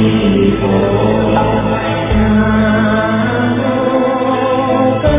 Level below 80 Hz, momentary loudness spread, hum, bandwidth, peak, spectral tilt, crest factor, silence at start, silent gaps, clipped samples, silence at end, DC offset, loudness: -26 dBFS; 3 LU; none; 3.8 kHz; 0 dBFS; -11 dB/octave; 12 dB; 0 s; none; under 0.1%; 0 s; under 0.1%; -13 LUFS